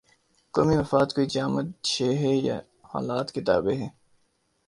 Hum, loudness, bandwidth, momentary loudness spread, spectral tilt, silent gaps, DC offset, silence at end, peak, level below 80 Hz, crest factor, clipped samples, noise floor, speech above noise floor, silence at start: none; -26 LUFS; 11.5 kHz; 10 LU; -5.5 dB/octave; none; under 0.1%; 0.8 s; -6 dBFS; -54 dBFS; 20 dB; under 0.1%; -70 dBFS; 45 dB; 0.55 s